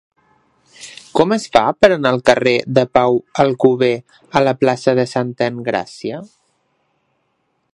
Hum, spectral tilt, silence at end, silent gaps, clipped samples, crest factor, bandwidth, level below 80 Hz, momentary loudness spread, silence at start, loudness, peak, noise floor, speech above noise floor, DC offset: none; -5.5 dB/octave; 1.5 s; none; under 0.1%; 16 dB; 11.5 kHz; -54 dBFS; 14 LU; 0.8 s; -16 LUFS; 0 dBFS; -67 dBFS; 52 dB; under 0.1%